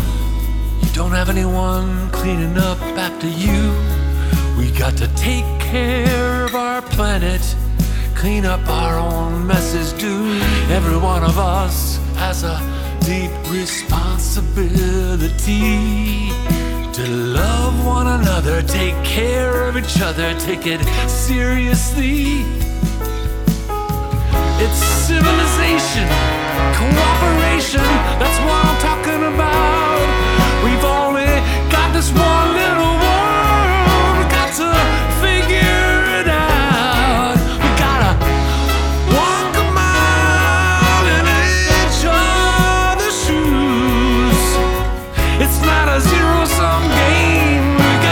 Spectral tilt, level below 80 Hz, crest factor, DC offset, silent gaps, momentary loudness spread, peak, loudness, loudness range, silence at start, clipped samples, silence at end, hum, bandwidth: -5 dB/octave; -18 dBFS; 14 dB; under 0.1%; none; 7 LU; 0 dBFS; -15 LUFS; 5 LU; 0 s; under 0.1%; 0 s; none; 20 kHz